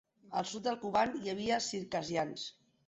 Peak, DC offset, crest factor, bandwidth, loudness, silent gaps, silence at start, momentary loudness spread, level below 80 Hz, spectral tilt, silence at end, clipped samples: -18 dBFS; under 0.1%; 18 dB; 8.2 kHz; -36 LUFS; none; 0.25 s; 8 LU; -70 dBFS; -3.5 dB/octave; 0.35 s; under 0.1%